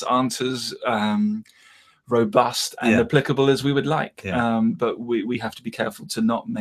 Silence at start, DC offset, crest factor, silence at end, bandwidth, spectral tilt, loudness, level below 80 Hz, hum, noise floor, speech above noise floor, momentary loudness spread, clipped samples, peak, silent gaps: 0 s; under 0.1%; 20 dB; 0 s; 15 kHz; -5 dB/octave; -22 LUFS; -58 dBFS; none; -54 dBFS; 32 dB; 9 LU; under 0.1%; -2 dBFS; none